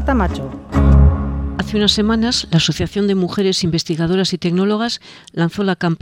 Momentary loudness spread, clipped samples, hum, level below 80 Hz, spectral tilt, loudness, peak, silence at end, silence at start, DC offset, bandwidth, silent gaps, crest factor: 8 LU; under 0.1%; none; -22 dBFS; -5.5 dB/octave; -17 LUFS; 0 dBFS; 0.05 s; 0 s; under 0.1%; 11.5 kHz; none; 16 dB